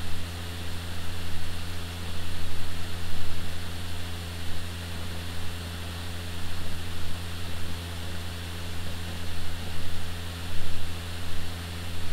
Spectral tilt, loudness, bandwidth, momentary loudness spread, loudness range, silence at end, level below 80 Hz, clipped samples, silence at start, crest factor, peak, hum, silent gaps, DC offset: -4 dB/octave; -36 LUFS; 15.5 kHz; 0 LU; 0 LU; 0 s; -38 dBFS; under 0.1%; 0 s; 14 dB; -10 dBFS; none; none; under 0.1%